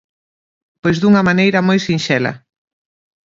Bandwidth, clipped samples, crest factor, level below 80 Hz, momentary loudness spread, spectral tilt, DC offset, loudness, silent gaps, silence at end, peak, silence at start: 7.6 kHz; under 0.1%; 16 dB; -52 dBFS; 8 LU; -6 dB/octave; under 0.1%; -14 LUFS; none; 0.9 s; 0 dBFS; 0.85 s